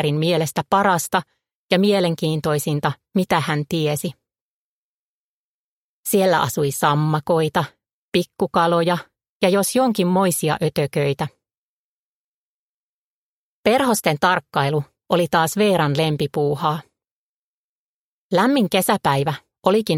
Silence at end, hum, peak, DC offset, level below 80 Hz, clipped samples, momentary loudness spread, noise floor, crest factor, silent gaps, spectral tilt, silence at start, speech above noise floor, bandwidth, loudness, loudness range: 0 s; none; -2 dBFS; under 0.1%; -58 dBFS; under 0.1%; 6 LU; under -90 dBFS; 20 dB; 1.55-1.69 s, 4.41-6.03 s, 7.93-8.12 s, 9.29-9.40 s, 11.57-13.64 s, 17.11-18.30 s; -5 dB/octave; 0 s; over 71 dB; 16.5 kHz; -20 LUFS; 5 LU